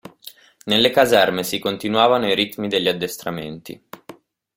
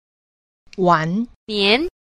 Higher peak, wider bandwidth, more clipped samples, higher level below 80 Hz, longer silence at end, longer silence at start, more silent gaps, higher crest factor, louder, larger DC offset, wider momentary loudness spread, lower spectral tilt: about the same, -2 dBFS vs -2 dBFS; first, 16.5 kHz vs 11.5 kHz; neither; second, -58 dBFS vs -50 dBFS; first, 0.45 s vs 0.2 s; second, 0.05 s vs 0.75 s; second, none vs 1.36-1.47 s; about the same, 20 dB vs 18 dB; about the same, -18 LUFS vs -18 LUFS; neither; first, 22 LU vs 9 LU; second, -4 dB/octave vs -6 dB/octave